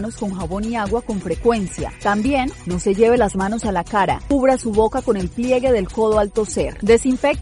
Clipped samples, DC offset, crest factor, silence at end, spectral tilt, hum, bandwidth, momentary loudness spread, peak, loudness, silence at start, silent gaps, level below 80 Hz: under 0.1%; under 0.1%; 16 dB; 0 s; -5.5 dB/octave; none; 11.5 kHz; 8 LU; -2 dBFS; -19 LUFS; 0 s; none; -34 dBFS